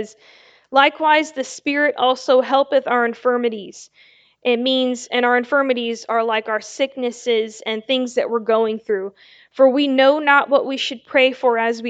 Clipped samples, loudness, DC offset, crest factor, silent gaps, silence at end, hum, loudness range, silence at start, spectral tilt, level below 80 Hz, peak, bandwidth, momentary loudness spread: under 0.1%; -18 LUFS; under 0.1%; 18 dB; none; 0 s; none; 4 LU; 0 s; -3 dB/octave; -74 dBFS; 0 dBFS; 8.8 kHz; 10 LU